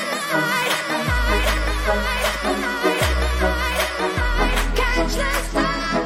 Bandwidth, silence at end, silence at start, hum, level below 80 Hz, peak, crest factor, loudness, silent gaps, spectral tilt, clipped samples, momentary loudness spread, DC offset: 16.5 kHz; 0 s; 0 s; none; -26 dBFS; -6 dBFS; 14 dB; -20 LUFS; none; -4 dB/octave; under 0.1%; 2 LU; under 0.1%